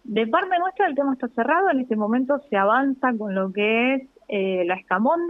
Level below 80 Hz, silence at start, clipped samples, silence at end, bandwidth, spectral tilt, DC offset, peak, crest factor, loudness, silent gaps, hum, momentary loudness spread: -70 dBFS; 0.1 s; under 0.1%; 0 s; 4 kHz; -8 dB/octave; under 0.1%; -6 dBFS; 16 dB; -22 LUFS; none; none; 5 LU